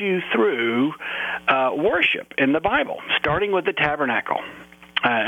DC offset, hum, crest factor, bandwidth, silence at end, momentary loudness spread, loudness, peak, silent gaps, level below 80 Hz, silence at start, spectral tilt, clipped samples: under 0.1%; none; 16 dB; 15 kHz; 0 s; 7 LU; -21 LUFS; -6 dBFS; none; -52 dBFS; 0 s; -6 dB/octave; under 0.1%